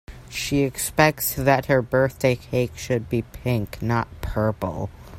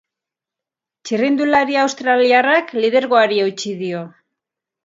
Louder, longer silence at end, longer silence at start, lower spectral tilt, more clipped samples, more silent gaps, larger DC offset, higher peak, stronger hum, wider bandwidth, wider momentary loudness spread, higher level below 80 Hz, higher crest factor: second, -23 LUFS vs -16 LUFS; second, 0 s vs 0.75 s; second, 0.1 s vs 1.05 s; first, -5.5 dB/octave vs -4 dB/octave; neither; neither; neither; about the same, -2 dBFS vs 0 dBFS; neither; first, 16 kHz vs 7.8 kHz; about the same, 10 LU vs 12 LU; first, -42 dBFS vs -66 dBFS; about the same, 22 dB vs 18 dB